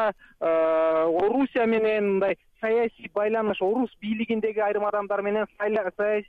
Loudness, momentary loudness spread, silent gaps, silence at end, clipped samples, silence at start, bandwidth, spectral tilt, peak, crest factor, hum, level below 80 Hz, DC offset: -25 LUFS; 6 LU; none; 0.05 s; under 0.1%; 0 s; 4.8 kHz; -8 dB/octave; -14 dBFS; 10 dB; none; -62 dBFS; under 0.1%